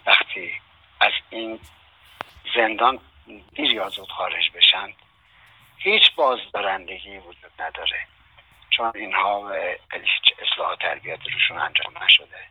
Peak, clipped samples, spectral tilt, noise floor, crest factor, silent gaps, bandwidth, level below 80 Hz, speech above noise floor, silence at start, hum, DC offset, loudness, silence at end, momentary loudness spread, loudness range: 0 dBFS; under 0.1%; -3 dB/octave; -54 dBFS; 24 dB; none; over 20 kHz; -60 dBFS; 32 dB; 0.05 s; none; under 0.1%; -20 LUFS; 0.05 s; 20 LU; 6 LU